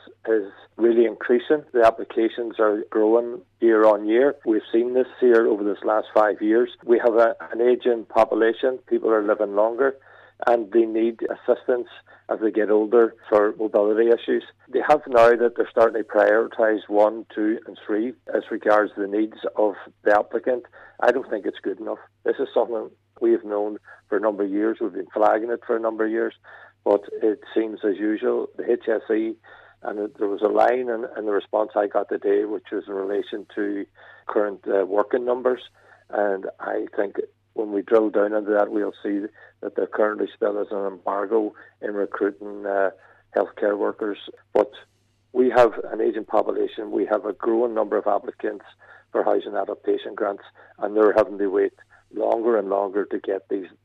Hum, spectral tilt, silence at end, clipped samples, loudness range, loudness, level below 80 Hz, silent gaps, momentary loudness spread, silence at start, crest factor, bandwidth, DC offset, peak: none; -6.5 dB/octave; 0.15 s; under 0.1%; 6 LU; -22 LUFS; -66 dBFS; none; 10 LU; 0.25 s; 16 dB; 7.6 kHz; under 0.1%; -6 dBFS